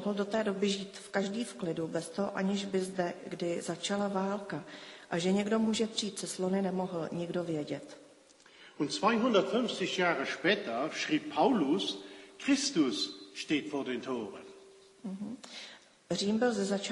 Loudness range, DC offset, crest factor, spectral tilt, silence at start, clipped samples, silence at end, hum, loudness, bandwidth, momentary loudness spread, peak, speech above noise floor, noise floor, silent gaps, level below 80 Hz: 5 LU; under 0.1%; 20 dB; -4.5 dB/octave; 0 s; under 0.1%; 0 s; none; -33 LUFS; 11.5 kHz; 14 LU; -12 dBFS; 27 dB; -59 dBFS; none; -74 dBFS